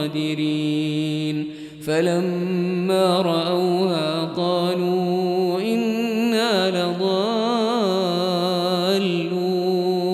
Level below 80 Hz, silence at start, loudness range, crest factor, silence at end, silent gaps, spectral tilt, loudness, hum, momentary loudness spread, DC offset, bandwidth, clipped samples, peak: -66 dBFS; 0 s; 1 LU; 14 dB; 0 s; none; -6 dB/octave; -21 LUFS; none; 4 LU; under 0.1%; 13.5 kHz; under 0.1%; -8 dBFS